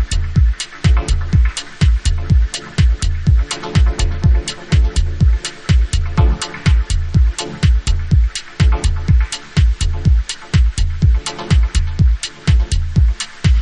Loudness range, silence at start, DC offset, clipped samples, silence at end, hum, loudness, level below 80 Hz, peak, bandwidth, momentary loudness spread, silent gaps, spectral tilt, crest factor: 0 LU; 0 s; under 0.1%; under 0.1%; 0 s; none; -17 LUFS; -16 dBFS; 0 dBFS; 10.5 kHz; 3 LU; none; -5 dB/octave; 12 dB